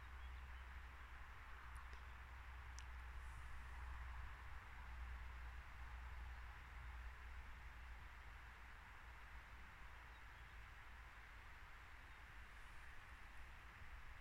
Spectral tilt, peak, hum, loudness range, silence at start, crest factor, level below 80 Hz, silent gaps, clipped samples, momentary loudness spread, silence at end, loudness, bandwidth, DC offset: -4 dB/octave; -36 dBFS; none; 4 LU; 0 s; 20 dB; -58 dBFS; none; under 0.1%; 5 LU; 0 s; -58 LUFS; 16 kHz; under 0.1%